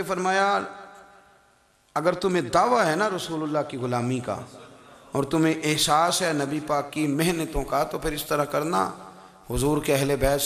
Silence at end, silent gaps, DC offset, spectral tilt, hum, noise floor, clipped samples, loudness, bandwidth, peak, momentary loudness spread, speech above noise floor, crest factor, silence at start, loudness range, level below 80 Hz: 0 s; none; under 0.1%; -4.5 dB/octave; none; -61 dBFS; under 0.1%; -24 LUFS; 15 kHz; -6 dBFS; 10 LU; 37 dB; 18 dB; 0 s; 2 LU; -44 dBFS